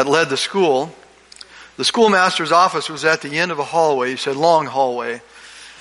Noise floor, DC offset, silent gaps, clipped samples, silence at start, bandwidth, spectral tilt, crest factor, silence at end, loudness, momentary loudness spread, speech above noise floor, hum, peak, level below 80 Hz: -43 dBFS; under 0.1%; none; under 0.1%; 0 s; 11.5 kHz; -3.5 dB/octave; 16 dB; 0.05 s; -17 LUFS; 14 LU; 26 dB; none; -2 dBFS; -64 dBFS